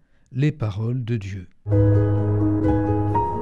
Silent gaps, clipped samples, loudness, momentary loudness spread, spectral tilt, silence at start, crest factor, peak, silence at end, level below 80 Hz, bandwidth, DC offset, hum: none; under 0.1%; -22 LUFS; 10 LU; -10 dB/octave; 0 s; 12 dB; -8 dBFS; 0 s; -38 dBFS; 6.6 kHz; under 0.1%; none